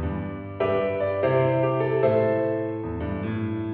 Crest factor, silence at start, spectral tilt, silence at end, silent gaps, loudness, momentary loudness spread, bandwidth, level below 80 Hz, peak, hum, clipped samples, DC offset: 16 dB; 0 s; -7 dB/octave; 0 s; none; -25 LUFS; 9 LU; 4.6 kHz; -46 dBFS; -8 dBFS; none; under 0.1%; under 0.1%